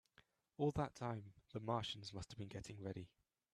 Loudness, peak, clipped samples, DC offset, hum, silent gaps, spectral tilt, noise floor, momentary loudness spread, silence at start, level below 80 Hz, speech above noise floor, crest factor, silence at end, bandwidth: -46 LUFS; -26 dBFS; under 0.1%; under 0.1%; none; none; -6 dB/octave; -75 dBFS; 12 LU; 0.6 s; -68 dBFS; 30 dB; 20 dB; 0.45 s; 13 kHz